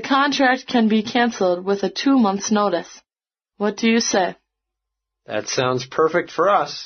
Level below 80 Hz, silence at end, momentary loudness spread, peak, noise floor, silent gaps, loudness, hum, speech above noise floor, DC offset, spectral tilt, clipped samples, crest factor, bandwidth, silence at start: -66 dBFS; 0 s; 8 LU; -4 dBFS; under -90 dBFS; none; -19 LUFS; none; over 71 dB; under 0.1%; -3 dB/octave; under 0.1%; 16 dB; 6.6 kHz; 0 s